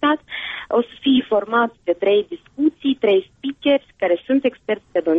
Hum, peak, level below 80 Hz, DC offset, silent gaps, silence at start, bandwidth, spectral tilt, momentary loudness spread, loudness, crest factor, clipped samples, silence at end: none; -6 dBFS; -60 dBFS; under 0.1%; none; 0 s; 3.9 kHz; -7 dB/octave; 7 LU; -20 LUFS; 12 dB; under 0.1%; 0 s